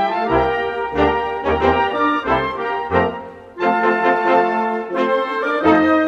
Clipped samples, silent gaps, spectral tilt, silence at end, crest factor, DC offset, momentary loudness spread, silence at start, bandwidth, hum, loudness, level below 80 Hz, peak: under 0.1%; none; -7 dB/octave; 0 s; 16 dB; under 0.1%; 6 LU; 0 s; 8 kHz; none; -18 LUFS; -40 dBFS; -2 dBFS